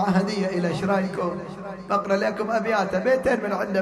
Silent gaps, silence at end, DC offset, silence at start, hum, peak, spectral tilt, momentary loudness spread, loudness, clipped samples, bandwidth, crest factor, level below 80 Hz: none; 0 s; under 0.1%; 0 s; none; -10 dBFS; -6.5 dB/octave; 7 LU; -24 LUFS; under 0.1%; 12.5 kHz; 14 dB; -54 dBFS